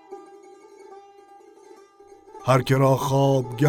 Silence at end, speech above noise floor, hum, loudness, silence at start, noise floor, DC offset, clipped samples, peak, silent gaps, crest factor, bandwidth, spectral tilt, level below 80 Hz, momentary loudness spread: 0 s; 31 dB; none; -21 LUFS; 0.1 s; -50 dBFS; under 0.1%; under 0.1%; -6 dBFS; none; 18 dB; 16.5 kHz; -6.5 dB/octave; -58 dBFS; 20 LU